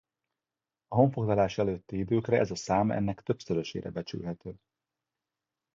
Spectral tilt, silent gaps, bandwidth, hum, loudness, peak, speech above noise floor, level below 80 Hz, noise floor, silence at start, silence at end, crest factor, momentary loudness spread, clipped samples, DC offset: -7 dB/octave; none; 7.6 kHz; none; -30 LUFS; -10 dBFS; over 61 dB; -56 dBFS; under -90 dBFS; 0.9 s; 1.2 s; 22 dB; 11 LU; under 0.1%; under 0.1%